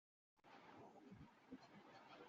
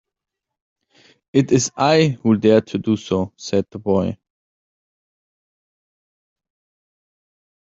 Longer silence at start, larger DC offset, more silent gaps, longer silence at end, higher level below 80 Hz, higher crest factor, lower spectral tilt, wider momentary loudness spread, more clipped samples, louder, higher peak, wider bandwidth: second, 0.35 s vs 1.35 s; neither; neither; second, 0 s vs 3.6 s; second, -86 dBFS vs -60 dBFS; about the same, 18 dB vs 20 dB; about the same, -4.5 dB/octave vs -5.5 dB/octave; second, 3 LU vs 8 LU; neither; second, -64 LUFS vs -18 LUFS; second, -46 dBFS vs -2 dBFS; about the same, 7.2 kHz vs 7.8 kHz